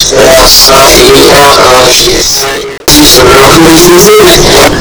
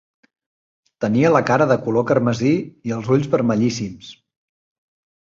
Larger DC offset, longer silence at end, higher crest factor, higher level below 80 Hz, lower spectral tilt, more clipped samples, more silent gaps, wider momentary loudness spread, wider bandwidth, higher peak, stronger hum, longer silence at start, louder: neither; second, 0 s vs 1.1 s; second, 2 dB vs 18 dB; first, -18 dBFS vs -56 dBFS; second, -2.5 dB/octave vs -7 dB/octave; first, 60% vs under 0.1%; neither; second, 5 LU vs 11 LU; first, over 20 kHz vs 7.6 kHz; about the same, 0 dBFS vs -2 dBFS; neither; second, 0 s vs 1 s; first, -1 LUFS vs -18 LUFS